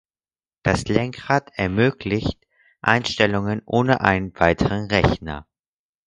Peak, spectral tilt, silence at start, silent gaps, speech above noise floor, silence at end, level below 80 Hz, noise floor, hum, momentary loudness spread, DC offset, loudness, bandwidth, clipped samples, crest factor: 0 dBFS; -6 dB/octave; 0.65 s; none; over 70 dB; 0.65 s; -38 dBFS; under -90 dBFS; none; 8 LU; under 0.1%; -21 LUFS; 11 kHz; under 0.1%; 22 dB